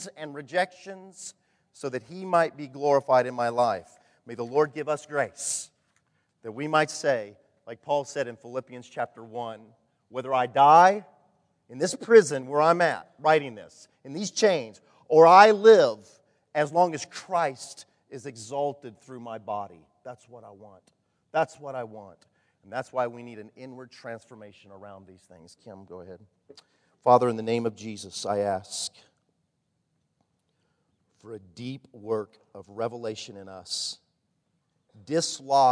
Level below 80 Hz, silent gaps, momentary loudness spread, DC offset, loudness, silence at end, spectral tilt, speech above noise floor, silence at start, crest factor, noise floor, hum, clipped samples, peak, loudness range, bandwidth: -80 dBFS; none; 25 LU; under 0.1%; -24 LUFS; 0 s; -4 dB/octave; 51 dB; 0 s; 24 dB; -76 dBFS; none; under 0.1%; -2 dBFS; 18 LU; 11 kHz